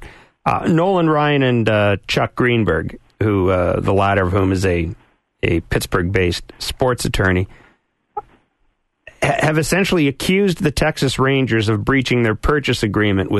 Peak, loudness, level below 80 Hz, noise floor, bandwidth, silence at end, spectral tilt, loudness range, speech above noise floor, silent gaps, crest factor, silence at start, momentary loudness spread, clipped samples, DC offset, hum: -4 dBFS; -17 LUFS; -34 dBFS; -64 dBFS; 12.5 kHz; 0 s; -6 dB/octave; 4 LU; 48 dB; none; 14 dB; 0 s; 7 LU; under 0.1%; under 0.1%; none